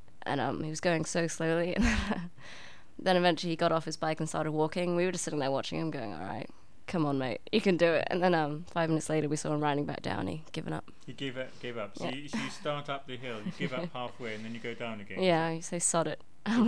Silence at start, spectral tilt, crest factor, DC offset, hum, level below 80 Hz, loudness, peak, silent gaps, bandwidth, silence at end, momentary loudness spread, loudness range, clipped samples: 0.25 s; -4.5 dB/octave; 20 dB; 0.6%; none; -50 dBFS; -32 LUFS; -12 dBFS; none; 11 kHz; 0 s; 12 LU; 7 LU; under 0.1%